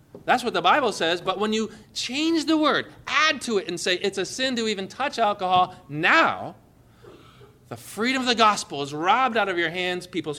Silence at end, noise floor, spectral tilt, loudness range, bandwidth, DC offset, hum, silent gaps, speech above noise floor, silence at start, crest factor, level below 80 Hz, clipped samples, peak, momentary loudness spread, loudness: 0 s; -51 dBFS; -3 dB/octave; 2 LU; 16.5 kHz; under 0.1%; none; none; 27 dB; 0.15 s; 20 dB; -62 dBFS; under 0.1%; -4 dBFS; 9 LU; -23 LUFS